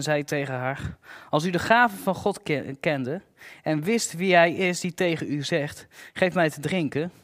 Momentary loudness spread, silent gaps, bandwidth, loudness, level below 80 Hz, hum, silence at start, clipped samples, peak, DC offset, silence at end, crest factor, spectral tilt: 15 LU; none; 16 kHz; -25 LUFS; -58 dBFS; none; 0 s; under 0.1%; -4 dBFS; under 0.1%; 0.15 s; 22 dB; -5 dB/octave